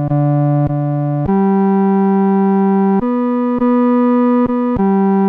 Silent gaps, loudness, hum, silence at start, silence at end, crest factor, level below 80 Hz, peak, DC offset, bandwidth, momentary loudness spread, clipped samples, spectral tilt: none; -14 LUFS; none; 0 s; 0 s; 8 dB; -42 dBFS; -6 dBFS; under 0.1%; 3.6 kHz; 4 LU; under 0.1%; -12 dB/octave